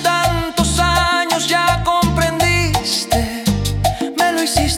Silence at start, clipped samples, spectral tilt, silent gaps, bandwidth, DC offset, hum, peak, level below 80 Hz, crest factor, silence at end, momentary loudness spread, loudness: 0 s; under 0.1%; -4 dB/octave; none; 18 kHz; under 0.1%; none; -2 dBFS; -28 dBFS; 14 dB; 0 s; 4 LU; -16 LUFS